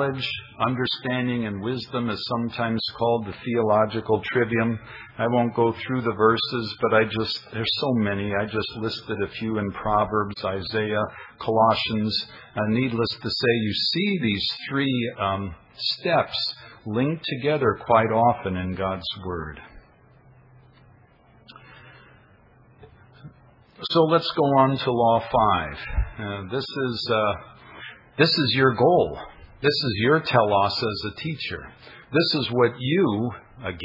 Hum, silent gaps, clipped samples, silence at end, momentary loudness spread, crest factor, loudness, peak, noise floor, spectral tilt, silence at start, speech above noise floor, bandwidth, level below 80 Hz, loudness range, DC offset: none; none; under 0.1%; 0 s; 11 LU; 20 dB; -23 LUFS; -4 dBFS; -55 dBFS; -7 dB/octave; 0 s; 31 dB; 5.8 kHz; -46 dBFS; 4 LU; under 0.1%